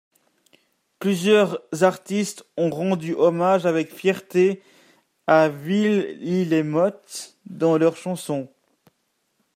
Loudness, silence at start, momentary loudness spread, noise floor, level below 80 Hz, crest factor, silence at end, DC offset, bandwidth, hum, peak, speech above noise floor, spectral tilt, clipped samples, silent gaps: -21 LUFS; 1 s; 12 LU; -71 dBFS; -72 dBFS; 20 dB; 1.1 s; under 0.1%; 16 kHz; none; -2 dBFS; 50 dB; -6 dB/octave; under 0.1%; none